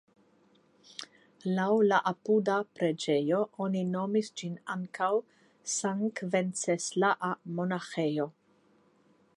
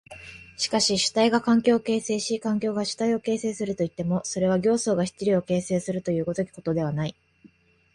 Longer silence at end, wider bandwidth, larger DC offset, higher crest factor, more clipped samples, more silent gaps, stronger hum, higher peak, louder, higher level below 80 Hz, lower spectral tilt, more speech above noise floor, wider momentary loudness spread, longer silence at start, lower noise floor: first, 1.05 s vs 0.45 s; about the same, 11.5 kHz vs 11.5 kHz; neither; about the same, 18 dB vs 16 dB; neither; neither; neither; second, -12 dBFS vs -8 dBFS; second, -30 LUFS vs -25 LUFS; second, -82 dBFS vs -60 dBFS; about the same, -5 dB/octave vs -4.5 dB/octave; first, 36 dB vs 32 dB; first, 12 LU vs 8 LU; first, 1 s vs 0.1 s; first, -66 dBFS vs -57 dBFS